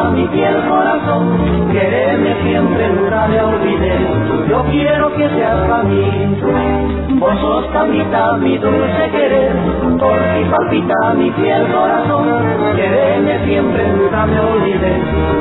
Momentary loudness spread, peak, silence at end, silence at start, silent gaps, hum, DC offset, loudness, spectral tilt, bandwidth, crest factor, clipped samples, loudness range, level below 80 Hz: 2 LU; -2 dBFS; 0 s; 0 s; none; none; under 0.1%; -13 LUFS; -11 dB/octave; 4.1 kHz; 10 dB; under 0.1%; 1 LU; -28 dBFS